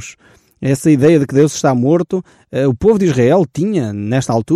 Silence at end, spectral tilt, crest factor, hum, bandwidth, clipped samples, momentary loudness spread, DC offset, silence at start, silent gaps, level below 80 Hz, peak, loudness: 0 s; -7 dB/octave; 12 dB; none; 14 kHz; under 0.1%; 10 LU; under 0.1%; 0 s; none; -44 dBFS; -2 dBFS; -14 LUFS